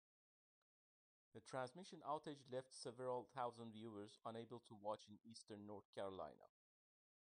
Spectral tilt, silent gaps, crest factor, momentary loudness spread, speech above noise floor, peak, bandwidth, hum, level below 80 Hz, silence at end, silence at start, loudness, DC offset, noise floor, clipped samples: -5 dB/octave; 5.85-5.93 s; 20 dB; 9 LU; over 37 dB; -34 dBFS; 10 kHz; none; under -90 dBFS; 0.75 s; 1.35 s; -54 LUFS; under 0.1%; under -90 dBFS; under 0.1%